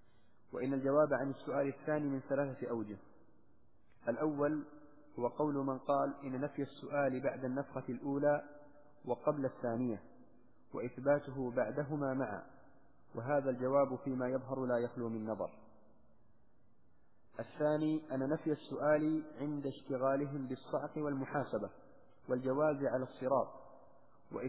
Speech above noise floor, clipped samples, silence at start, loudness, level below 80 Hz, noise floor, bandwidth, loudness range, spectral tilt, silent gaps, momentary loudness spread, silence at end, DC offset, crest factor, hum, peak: 37 dB; under 0.1%; 0.55 s; -37 LUFS; -76 dBFS; -73 dBFS; 4 kHz; 3 LU; -7.5 dB/octave; none; 11 LU; 0 s; 0.1%; 18 dB; none; -18 dBFS